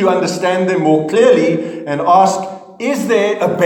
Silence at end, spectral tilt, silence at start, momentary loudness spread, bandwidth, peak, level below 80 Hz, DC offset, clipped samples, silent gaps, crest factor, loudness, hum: 0 s; -5.5 dB/octave; 0 s; 10 LU; 17.5 kHz; 0 dBFS; -66 dBFS; under 0.1%; under 0.1%; none; 12 dB; -14 LUFS; none